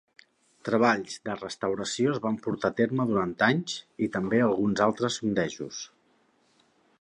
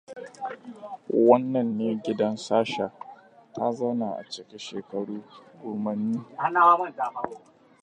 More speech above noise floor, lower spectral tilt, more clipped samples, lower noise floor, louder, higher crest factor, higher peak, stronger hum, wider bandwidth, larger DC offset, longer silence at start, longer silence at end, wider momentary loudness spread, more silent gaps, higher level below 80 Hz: first, 40 dB vs 23 dB; about the same, -5 dB/octave vs -6 dB/octave; neither; first, -67 dBFS vs -49 dBFS; about the same, -27 LUFS vs -26 LUFS; about the same, 20 dB vs 22 dB; second, -8 dBFS vs -4 dBFS; neither; about the same, 10.5 kHz vs 9.6 kHz; neither; first, 0.65 s vs 0.1 s; first, 1.15 s vs 0.45 s; second, 11 LU vs 21 LU; neither; first, -64 dBFS vs -74 dBFS